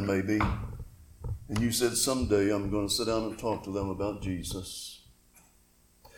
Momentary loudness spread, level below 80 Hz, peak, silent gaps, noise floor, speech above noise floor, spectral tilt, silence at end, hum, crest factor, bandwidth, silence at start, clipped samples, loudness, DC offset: 16 LU; -46 dBFS; -12 dBFS; none; -63 dBFS; 33 dB; -4.5 dB/octave; 0 s; none; 18 dB; 18 kHz; 0 s; under 0.1%; -30 LUFS; under 0.1%